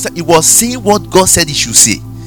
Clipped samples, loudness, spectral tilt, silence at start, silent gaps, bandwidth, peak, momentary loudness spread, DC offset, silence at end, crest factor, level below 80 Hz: 2%; -8 LUFS; -2.5 dB/octave; 0 s; none; over 20 kHz; 0 dBFS; 5 LU; 0.7%; 0 s; 10 dB; -34 dBFS